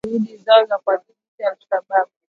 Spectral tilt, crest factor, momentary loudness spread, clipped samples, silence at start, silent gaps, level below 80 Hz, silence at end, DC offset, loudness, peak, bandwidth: -6 dB/octave; 18 dB; 11 LU; under 0.1%; 0.05 s; 1.28-1.38 s; -66 dBFS; 0.3 s; under 0.1%; -19 LUFS; 0 dBFS; 4.8 kHz